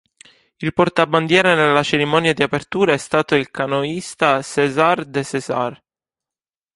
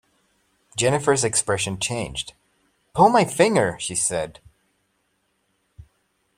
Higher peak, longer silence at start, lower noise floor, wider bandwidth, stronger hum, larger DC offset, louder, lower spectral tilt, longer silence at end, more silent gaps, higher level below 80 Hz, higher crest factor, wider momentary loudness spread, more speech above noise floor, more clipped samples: about the same, 0 dBFS vs -2 dBFS; second, 0.6 s vs 0.75 s; first, under -90 dBFS vs -70 dBFS; second, 11.5 kHz vs 16 kHz; neither; neither; first, -17 LUFS vs -21 LUFS; first, -5 dB/octave vs -3.5 dB/octave; first, 1 s vs 0.55 s; neither; about the same, -56 dBFS vs -54 dBFS; about the same, 18 dB vs 22 dB; second, 9 LU vs 15 LU; first, over 73 dB vs 49 dB; neither